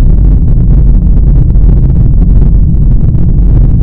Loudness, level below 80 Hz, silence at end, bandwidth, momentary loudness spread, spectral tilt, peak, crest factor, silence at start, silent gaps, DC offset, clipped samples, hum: -8 LUFS; -6 dBFS; 0 s; 1.6 kHz; 1 LU; -13 dB/octave; 0 dBFS; 4 dB; 0 s; none; under 0.1%; 10%; none